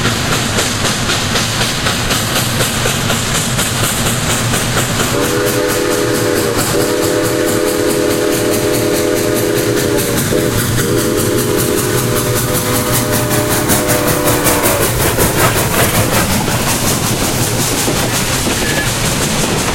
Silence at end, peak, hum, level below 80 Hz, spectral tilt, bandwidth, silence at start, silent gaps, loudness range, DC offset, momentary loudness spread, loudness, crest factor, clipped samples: 0 s; 0 dBFS; none; -30 dBFS; -3.5 dB/octave; 16.5 kHz; 0 s; none; 2 LU; under 0.1%; 2 LU; -13 LUFS; 14 dB; under 0.1%